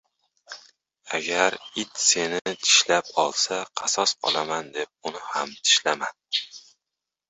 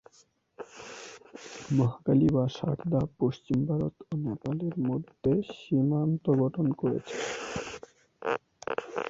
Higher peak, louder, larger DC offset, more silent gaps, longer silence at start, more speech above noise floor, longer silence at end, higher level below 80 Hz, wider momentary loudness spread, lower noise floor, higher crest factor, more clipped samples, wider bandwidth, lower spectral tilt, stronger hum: first, -4 dBFS vs -12 dBFS; first, -23 LUFS vs -30 LUFS; neither; neither; about the same, 0.5 s vs 0.6 s; first, 61 dB vs 36 dB; first, 0.7 s vs 0 s; second, -72 dBFS vs -58 dBFS; about the same, 15 LU vs 17 LU; first, -86 dBFS vs -64 dBFS; first, 22 dB vs 16 dB; neither; about the same, 8.4 kHz vs 8 kHz; second, 0 dB/octave vs -7.5 dB/octave; neither